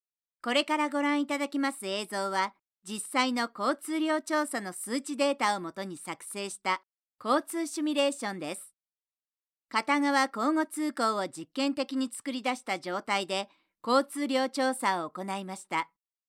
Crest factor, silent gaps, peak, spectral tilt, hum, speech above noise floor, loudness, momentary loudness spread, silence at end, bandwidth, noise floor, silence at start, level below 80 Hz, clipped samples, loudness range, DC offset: 20 dB; none; -12 dBFS; -3 dB/octave; none; over 60 dB; -30 LUFS; 11 LU; 0.45 s; 16 kHz; under -90 dBFS; 0.45 s; under -90 dBFS; under 0.1%; 3 LU; under 0.1%